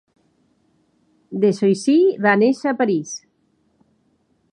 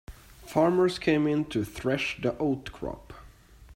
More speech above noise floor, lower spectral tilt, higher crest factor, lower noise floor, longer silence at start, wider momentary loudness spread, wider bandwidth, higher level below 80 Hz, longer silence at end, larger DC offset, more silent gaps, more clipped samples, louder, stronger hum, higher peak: first, 47 dB vs 25 dB; about the same, -6 dB/octave vs -6 dB/octave; about the same, 20 dB vs 20 dB; first, -64 dBFS vs -52 dBFS; first, 1.3 s vs 0.1 s; about the same, 16 LU vs 14 LU; second, 11 kHz vs 16 kHz; second, -74 dBFS vs -52 dBFS; first, 1.35 s vs 0 s; neither; neither; neither; first, -18 LUFS vs -27 LUFS; neither; first, -2 dBFS vs -10 dBFS